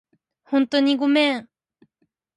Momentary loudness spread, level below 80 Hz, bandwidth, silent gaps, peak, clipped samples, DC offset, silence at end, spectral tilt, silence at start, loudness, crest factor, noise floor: 6 LU; -76 dBFS; 11 kHz; none; -6 dBFS; under 0.1%; under 0.1%; 0.95 s; -4 dB/octave; 0.5 s; -20 LUFS; 16 dB; -72 dBFS